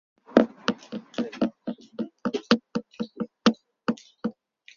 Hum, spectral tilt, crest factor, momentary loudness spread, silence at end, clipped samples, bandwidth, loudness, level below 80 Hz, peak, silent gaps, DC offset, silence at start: none; -5.5 dB/octave; 28 dB; 14 LU; 0.45 s; under 0.1%; 7.2 kHz; -28 LUFS; -68 dBFS; 0 dBFS; none; under 0.1%; 0.3 s